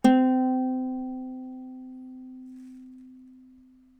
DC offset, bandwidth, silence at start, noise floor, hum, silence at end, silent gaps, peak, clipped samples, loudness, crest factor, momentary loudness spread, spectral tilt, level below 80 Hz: under 0.1%; 9.4 kHz; 0.05 s; -55 dBFS; none; 0.75 s; none; -6 dBFS; under 0.1%; -26 LUFS; 22 dB; 24 LU; -6 dB/octave; -62 dBFS